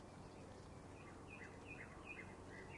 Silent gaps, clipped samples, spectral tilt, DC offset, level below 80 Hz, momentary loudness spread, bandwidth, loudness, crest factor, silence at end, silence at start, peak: none; under 0.1%; -5.5 dB/octave; under 0.1%; -68 dBFS; 4 LU; 11 kHz; -56 LUFS; 14 dB; 0 s; 0 s; -42 dBFS